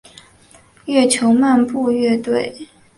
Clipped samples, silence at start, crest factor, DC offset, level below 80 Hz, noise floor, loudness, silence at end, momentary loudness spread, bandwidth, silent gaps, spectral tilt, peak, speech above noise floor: under 0.1%; 0.85 s; 16 dB; under 0.1%; -58 dBFS; -49 dBFS; -16 LUFS; 0.35 s; 8 LU; 11.5 kHz; none; -4 dB/octave; -2 dBFS; 33 dB